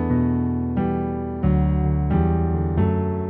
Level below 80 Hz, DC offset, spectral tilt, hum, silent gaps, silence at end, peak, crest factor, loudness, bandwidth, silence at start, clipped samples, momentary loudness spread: -28 dBFS; under 0.1%; -10.5 dB/octave; none; none; 0 s; -8 dBFS; 12 dB; -22 LUFS; 3.6 kHz; 0 s; under 0.1%; 4 LU